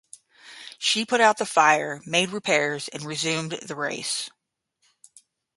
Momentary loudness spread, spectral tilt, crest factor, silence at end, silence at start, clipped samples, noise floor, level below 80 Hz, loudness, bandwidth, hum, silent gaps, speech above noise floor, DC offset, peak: 13 LU; -2.5 dB/octave; 22 dB; 1.3 s; 0.45 s; under 0.1%; -72 dBFS; -74 dBFS; -23 LUFS; 12 kHz; none; none; 49 dB; under 0.1%; -2 dBFS